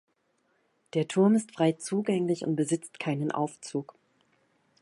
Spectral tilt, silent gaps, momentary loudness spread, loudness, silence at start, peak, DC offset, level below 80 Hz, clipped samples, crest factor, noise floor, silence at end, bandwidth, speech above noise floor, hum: -6 dB/octave; none; 10 LU; -29 LUFS; 0.95 s; -12 dBFS; under 0.1%; -78 dBFS; under 0.1%; 18 dB; -72 dBFS; 1 s; 11.5 kHz; 45 dB; none